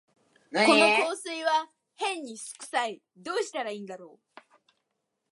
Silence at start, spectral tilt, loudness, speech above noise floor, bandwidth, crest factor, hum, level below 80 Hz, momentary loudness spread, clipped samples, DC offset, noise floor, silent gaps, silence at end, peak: 0.5 s; -2.5 dB/octave; -26 LUFS; 53 dB; 11.5 kHz; 24 dB; none; -86 dBFS; 21 LU; under 0.1%; under 0.1%; -81 dBFS; none; 1.25 s; -6 dBFS